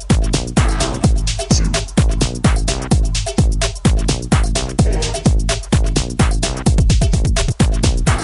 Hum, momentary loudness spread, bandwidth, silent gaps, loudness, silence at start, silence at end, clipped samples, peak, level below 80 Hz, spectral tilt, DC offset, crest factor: none; 2 LU; 11.5 kHz; none; -17 LUFS; 0 s; 0 s; under 0.1%; -2 dBFS; -18 dBFS; -5 dB/octave; under 0.1%; 14 dB